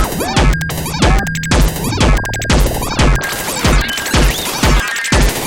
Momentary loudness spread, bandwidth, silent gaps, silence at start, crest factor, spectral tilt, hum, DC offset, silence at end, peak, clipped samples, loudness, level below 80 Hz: 3 LU; 17.5 kHz; none; 0 s; 12 dB; -4 dB/octave; none; under 0.1%; 0 s; 0 dBFS; under 0.1%; -14 LUFS; -16 dBFS